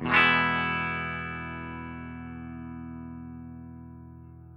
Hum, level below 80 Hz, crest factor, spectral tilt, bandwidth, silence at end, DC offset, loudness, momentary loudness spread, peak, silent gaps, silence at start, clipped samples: none; -56 dBFS; 22 dB; -6.5 dB/octave; 9.8 kHz; 0 s; under 0.1%; -26 LUFS; 24 LU; -8 dBFS; none; 0 s; under 0.1%